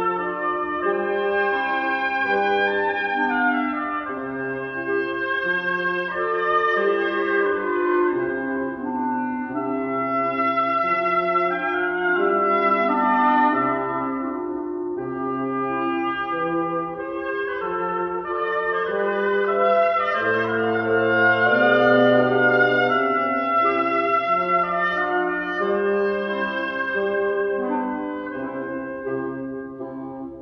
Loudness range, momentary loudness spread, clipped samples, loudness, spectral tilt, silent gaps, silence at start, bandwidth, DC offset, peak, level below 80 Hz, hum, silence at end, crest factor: 7 LU; 10 LU; under 0.1%; -22 LUFS; -7.5 dB/octave; none; 0 s; 6.4 kHz; under 0.1%; -6 dBFS; -60 dBFS; none; 0 s; 16 dB